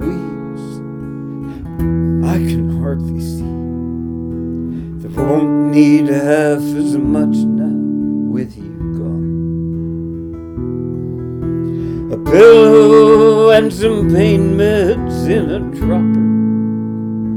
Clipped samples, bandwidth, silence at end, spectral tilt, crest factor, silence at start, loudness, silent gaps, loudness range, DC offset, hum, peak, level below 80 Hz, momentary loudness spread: under 0.1%; 15 kHz; 0 s; -7.5 dB/octave; 14 dB; 0 s; -13 LUFS; none; 12 LU; under 0.1%; none; 0 dBFS; -32 dBFS; 18 LU